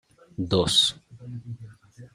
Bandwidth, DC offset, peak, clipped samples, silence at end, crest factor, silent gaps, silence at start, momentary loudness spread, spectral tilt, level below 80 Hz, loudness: 15.5 kHz; under 0.1%; -8 dBFS; under 0.1%; 0.05 s; 20 dB; none; 0.4 s; 22 LU; -4 dB/octave; -54 dBFS; -22 LUFS